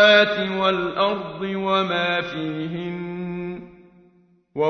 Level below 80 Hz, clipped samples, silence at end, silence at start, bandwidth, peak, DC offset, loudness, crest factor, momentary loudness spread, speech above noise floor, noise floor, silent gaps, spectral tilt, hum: -58 dBFS; under 0.1%; 0 s; 0 s; 6.4 kHz; -2 dBFS; under 0.1%; -22 LUFS; 20 dB; 11 LU; 37 dB; -58 dBFS; none; -5.5 dB/octave; none